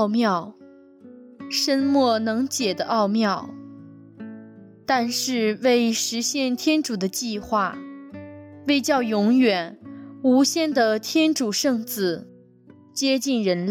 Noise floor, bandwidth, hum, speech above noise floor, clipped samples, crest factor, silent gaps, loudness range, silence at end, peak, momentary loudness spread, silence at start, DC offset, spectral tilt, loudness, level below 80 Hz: -51 dBFS; 17 kHz; none; 29 dB; under 0.1%; 14 dB; none; 3 LU; 0 s; -8 dBFS; 20 LU; 0 s; under 0.1%; -3.5 dB/octave; -22 LUFS; -66 dBFS